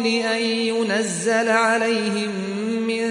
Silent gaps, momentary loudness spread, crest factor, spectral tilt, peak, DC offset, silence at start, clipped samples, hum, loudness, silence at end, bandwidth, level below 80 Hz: none; 7 LU; 16 dB; -3.5 dB/octave; -6 dBFS; under 0.1%; 0 s; under 0.1%; none; -21 LUFS; 0 s; 11.5 kHz; -68 dBFS